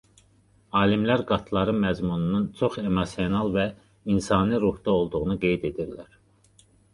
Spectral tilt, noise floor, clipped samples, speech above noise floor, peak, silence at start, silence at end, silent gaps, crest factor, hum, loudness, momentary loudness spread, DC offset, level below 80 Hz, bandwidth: -7 dB/octave; -60 dBFS; under 0.1%; 36 dB; -6 dBFS; 0.75 s; 0.9 s; none; 20 dB; none; -25 LUFS; 7 LU; under 0.1%; -46 dBFS; 11 kHz